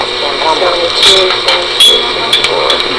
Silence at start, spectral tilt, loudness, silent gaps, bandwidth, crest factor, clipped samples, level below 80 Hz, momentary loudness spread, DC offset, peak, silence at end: 0 s; -1 dB/octave; -7 LUFS; none; 11 kHz; 10 dB; under 0.1%; -38 dBFS; 6 LU; under 0.1%; 0 dBFS; 0 s